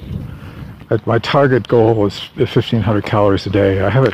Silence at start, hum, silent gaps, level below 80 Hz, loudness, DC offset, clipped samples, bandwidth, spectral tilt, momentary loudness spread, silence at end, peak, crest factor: 0 s; none; none; -40 dBFS; -15 LUFS; under 0.1%; under 0.1%; 9.2 kHz; -8 dB/octave; 16 LU; 0 s; 0 dBFS; 14 dB